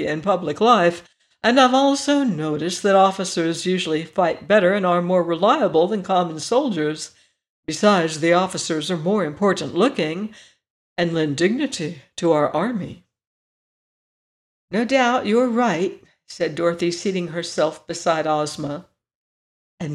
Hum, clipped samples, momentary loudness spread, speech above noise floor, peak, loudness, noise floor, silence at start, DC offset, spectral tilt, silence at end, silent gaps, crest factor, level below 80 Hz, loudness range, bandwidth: none; under 0.1%; 11 LU; over 70 dB; -2 dBFS; -20 LUFS; under -90 dBFS; 0 s; under 0.1%; -5 dB/octave; 0 s; 7.49-7.63 s, 10.70-10.96 s, 13.27-14.68 s, 19.15-19.78 s; 18 dB; -64 dBFS; 5 LU; 12.5 kHz